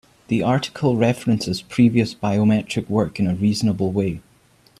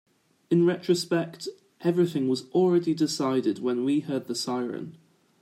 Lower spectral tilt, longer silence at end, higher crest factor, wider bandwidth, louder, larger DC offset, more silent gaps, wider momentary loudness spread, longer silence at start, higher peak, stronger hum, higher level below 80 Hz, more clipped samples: about the same, -6.5 dB/octave vs -6 dB/octave; first, 0.6 s vs 0.45 s; about the same, 16 dB vs 16 dB; second, 13 kHz vs 15 kHz; first, -20 LUFS vs -26 LUFS; neither; neither; second, 6 LU vs 11 LU; second, 0.3 s vs 0.5 s; first, -4 dBFS vs -10 dBFS; neither; first, -52 dBFS vs -76 dBFS; neither